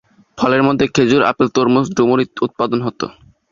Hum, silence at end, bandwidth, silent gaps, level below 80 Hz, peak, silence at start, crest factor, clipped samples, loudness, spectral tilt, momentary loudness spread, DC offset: none; 0.4 s; 7.4 kHz; none; -50 dBFS; 0 dBFS; 0.35 s; 16 dB; under 0.1%; -15 LUFS; -6 dB/octave; 7 LU; under 0.1%